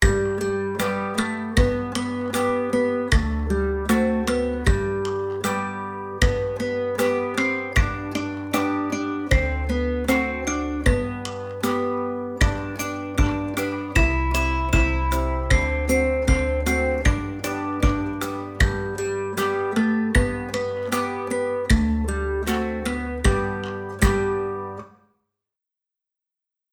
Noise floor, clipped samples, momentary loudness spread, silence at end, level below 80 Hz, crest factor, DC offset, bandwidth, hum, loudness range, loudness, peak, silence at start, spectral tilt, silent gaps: -87 dBFS; under 0.1%; 7 LU; 1.85 s; -28 dBFS; 20 dB; under 0.1%; over 20 kHz; none; 3 LU; -23 LUFS; -4 dBFS; 0 s; -5.5 dB/octave; none